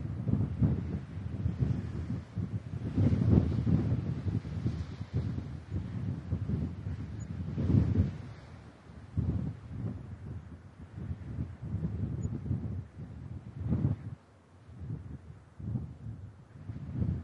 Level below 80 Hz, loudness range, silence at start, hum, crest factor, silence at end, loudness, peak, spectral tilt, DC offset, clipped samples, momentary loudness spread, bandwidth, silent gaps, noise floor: -48 dBFS; 8 LU; 0 s; none; 24 dB; 0 s; -35 LUFS; -8 dBFS; -9.5 dB/octave; under 0.1%; under 0.1%; 18 LU; 7.4 kHz; none; -58 dBFS